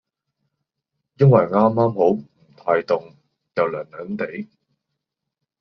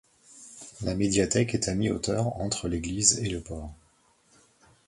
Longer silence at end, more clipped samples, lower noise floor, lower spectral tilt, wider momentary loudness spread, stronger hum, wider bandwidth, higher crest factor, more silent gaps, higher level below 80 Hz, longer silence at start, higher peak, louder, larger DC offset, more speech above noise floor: about the same, 1.15 s vs 1.15 s; neither; first, -81 dBFS vs -64 dBFS; first, -8 dB/octave vs -4 dB/octave; second, 16 LU vs 22 LU; neither; second, 6 kHz vs 11.5 kHz; second, 20 dB vs 26 dB; neither; second, -62 dBFS vs -46 dBFS; first, 1.2 s vs 0.3 s; about the same, -2 dBFS vs -2 dBFS; first, -20 LUFS vs -27 LUFS; neither; first, 63 dB vs 37 dB